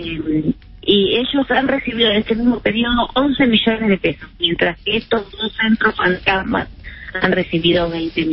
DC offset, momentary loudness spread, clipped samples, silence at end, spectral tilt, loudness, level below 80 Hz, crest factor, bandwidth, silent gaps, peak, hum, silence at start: under 0.1%; 8 LU; under 0.1%; 0 s; -10.5 dB/octave; -17 LUFS; -38 dBFS; 16 dB; 5.8 kHz; none; -2 dBFS; none; 0 s